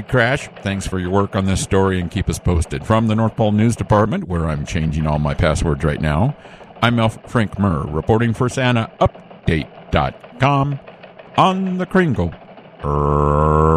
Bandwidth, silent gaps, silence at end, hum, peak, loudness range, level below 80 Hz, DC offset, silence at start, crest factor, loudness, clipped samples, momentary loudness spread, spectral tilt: 13 kHz; none; 0 s; none; 0 dBFS; 2 LU; -30 dBFS; under 0.1%; 0 s; 18 dB; -18 LUFS; under 0.1%; 7 LU; -6.5 dB/octave